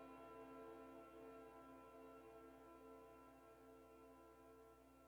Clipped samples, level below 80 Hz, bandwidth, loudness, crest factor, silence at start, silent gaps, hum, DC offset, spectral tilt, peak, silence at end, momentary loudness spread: under 0.1%; -80 dBFS; 19.5 kHz; -62 LUFS; 14 dB; 0 s; none; none; under 0.1%; -6 dB/octave; -48 dBFS; 0 s; 7 LU